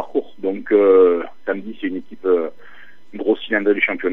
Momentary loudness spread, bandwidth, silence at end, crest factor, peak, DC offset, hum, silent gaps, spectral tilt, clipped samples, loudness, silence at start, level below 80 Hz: 14 LU; 4 kHz; 0 s; 16 dB; -2 dBFS; 2%; none; none; -7.5 dB/octave; under 0.1%; -18 LUFS; 0 s; -72 dBFS